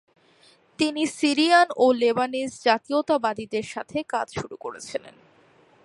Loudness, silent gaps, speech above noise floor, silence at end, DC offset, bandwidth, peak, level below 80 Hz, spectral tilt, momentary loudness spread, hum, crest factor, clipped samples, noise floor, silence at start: -23 LUFS; none; 34 dB; 0.75 s; under 0.1%; 11.5 kHz; -6 dBFS; -64 dBFS; -3.5 dB/octave; 16 LU; none; 20 dB; under 0.1%; -58 dBFS; 0.8 s